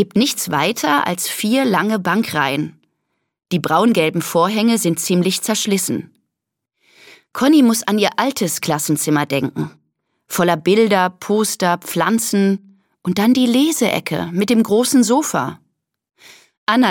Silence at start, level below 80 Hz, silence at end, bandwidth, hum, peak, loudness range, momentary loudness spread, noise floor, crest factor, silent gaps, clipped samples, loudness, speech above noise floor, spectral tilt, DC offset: 0 s; -64 dBFS; 0 s; 17.5 kHz; none; 0 dBFS; 2 LU; 9 LU; -80 dBFS; 16 dB; 16.57-16.67 s; under 0.1%; -17 LUFS; 64 dB; -4 dB/octave; under 0.1%